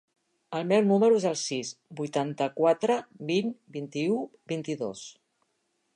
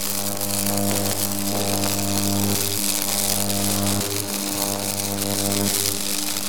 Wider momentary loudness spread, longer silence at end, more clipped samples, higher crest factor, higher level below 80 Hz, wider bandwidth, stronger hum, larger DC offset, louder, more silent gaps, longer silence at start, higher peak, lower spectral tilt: first, 14 LU vs 3 LU; first, 0.85 s vs 0 s; neither; about the same, 18 dB vs 20 dB; second, -80 dBFS vs -54 dBFS; second, 10.5 kHz vs over 20 kHz; neither; second, under 0.1% vs 3%; second, -28 LUFS vs -21 LUFS; neither; first, 0.5 s vs 0 s; second, -10 dBFS vs -2 dBFS; first, -5 dB/octave vs -3 dB/octave